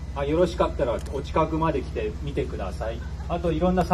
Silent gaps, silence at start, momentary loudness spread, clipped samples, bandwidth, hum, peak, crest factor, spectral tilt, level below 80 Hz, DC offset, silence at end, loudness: none; 0 s; 8 LU; under 0.1%; 13 kHz; none; -6 dBFS; 18 dB; -7.5 dB/octave; -34 dBFS; under 0.1%; 0 s; -26 LUFS